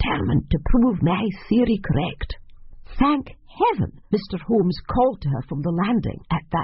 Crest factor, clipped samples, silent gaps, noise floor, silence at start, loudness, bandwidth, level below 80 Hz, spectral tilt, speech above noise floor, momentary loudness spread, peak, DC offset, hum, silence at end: 16 dB; under 0.1%; none; -40 dBFS; 0 s; -22 LUFS; 5.8 kHz; -32 dBFS; -6.5 dB/octave; 19 dB; 7 LU; -6 dBFS; under 0.1%; none; 0 s